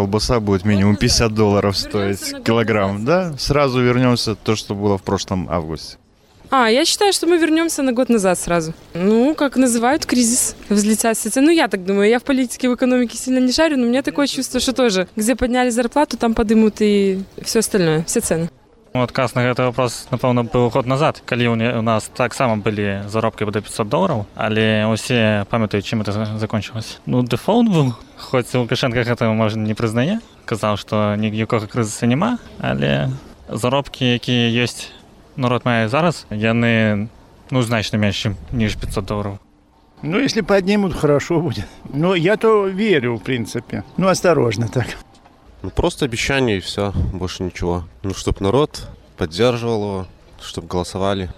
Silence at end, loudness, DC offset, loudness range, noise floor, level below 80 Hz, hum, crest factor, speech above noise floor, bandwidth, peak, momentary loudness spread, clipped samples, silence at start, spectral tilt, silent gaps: 0.05 s; -18 LUFS; under 0.1%; 4 LU; -52 dBFS; -38 dBFS; none; 14 dB; 34 dB; 16 kHz; -4 dBFS; 9 LU; under 0.1%; 0 s; -5 dB/octave; none